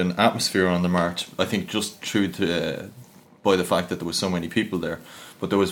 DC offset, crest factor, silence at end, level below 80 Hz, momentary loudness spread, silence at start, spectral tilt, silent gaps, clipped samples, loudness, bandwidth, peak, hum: under 0.1%; 20 dB; 0 s; -56 dBFS; 11 LU; 0 s; -4.5 dB/octave; none; under 0.1%; -24 LUFS; 18 kHz; -4 dBFS; none